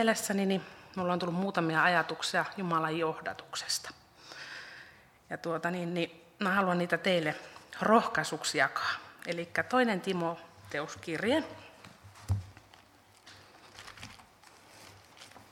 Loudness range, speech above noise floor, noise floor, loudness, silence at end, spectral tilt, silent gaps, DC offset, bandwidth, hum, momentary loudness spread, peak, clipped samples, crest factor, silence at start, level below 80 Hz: 9 LU; 29 dB; -60 dBFS; -31 LUFS; 0.1 s; -4.5 dB/octave; none; under 0.1%; 17 kHz; none; 22 LU; -10 dBFS; under 0.1%; 24 dB; 0 s; -62 dBFS